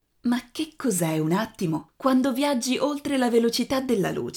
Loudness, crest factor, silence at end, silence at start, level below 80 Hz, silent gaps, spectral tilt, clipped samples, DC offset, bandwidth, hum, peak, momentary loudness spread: -25 LUFS; 16 dB; 0 s; 0.25 s; -60 dBFS; none; -5 dB/octave; under 0.1%; under 0.1%; 19.5 kHz; none; -8 dBFS; 6 LU